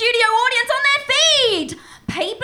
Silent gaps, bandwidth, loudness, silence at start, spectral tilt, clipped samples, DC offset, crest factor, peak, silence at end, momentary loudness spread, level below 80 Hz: none; 17 kHz; -15 LUFS; 0 s; -1 dB/octave; under 0.1%; under 0.1%; 14 dB; -2 dBFS; 0 s; 16 LU; -54 dBFS